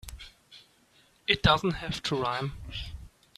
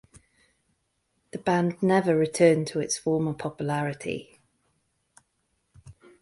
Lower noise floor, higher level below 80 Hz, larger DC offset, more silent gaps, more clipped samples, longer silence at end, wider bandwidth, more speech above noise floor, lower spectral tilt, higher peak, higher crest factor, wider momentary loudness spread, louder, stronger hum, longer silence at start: second, -63 dBFS vs -74 dBFS; first, -44 dBFS vs -64 dBFS; neither; neither; neither; about the same, 0.3 s vs 0.3 s; first, 14.5 kHz vs 11.5 kHz; second, 35 dB vs 50 dB; about the same, -5 dB/octave vs -5.5 dB/octave; about the same, -6 dBFS vs -6 dBFS; about the same, 26 dB vs 22 dB; first, 24 LU vs 13 LU; second, -28 LUFS vs -25 LUFS; neither; second, 0.05 s vs 1.35 s